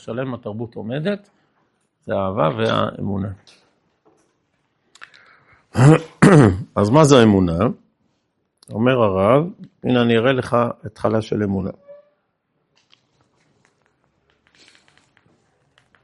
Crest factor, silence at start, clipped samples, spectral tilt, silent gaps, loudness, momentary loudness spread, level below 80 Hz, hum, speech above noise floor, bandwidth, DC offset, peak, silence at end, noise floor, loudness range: 20 dB; 0.05 s; under 0.1%; -7 dB/octave; none; -17 LUFS; 17 LU; -52 dBFS; none; 53 dB; 11.5 kHz; under 0.1%; 0 dBFS; 4.1 s; -70 dBFS; 12 LU